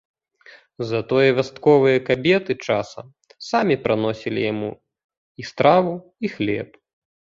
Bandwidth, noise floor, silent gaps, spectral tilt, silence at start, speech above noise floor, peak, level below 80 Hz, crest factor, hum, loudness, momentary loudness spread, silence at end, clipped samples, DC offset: 7.6 kHz; -50 dBFS; 5.04-5.09 s, 5.18-5.35 s; -6.5 dB/octave; 0.8 s; 30 dB; -2 dBFS; -58 dBFS; 20 dB; none; -20 LUFS; 17 LU; 0.55 s; under 0.1%; under 0.1%